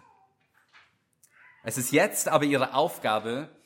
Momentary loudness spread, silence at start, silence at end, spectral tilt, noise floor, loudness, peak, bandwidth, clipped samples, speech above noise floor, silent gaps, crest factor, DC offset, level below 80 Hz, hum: 11 LU; 1.65 s; 0.2 s; -3.5 dB/octave; -67 dBFS; -26 LUFS; -6 dBFS; 17 kHz; under 0.1%; 41 dB; none; 22 dB; under 0.1%; -76 dBFS; none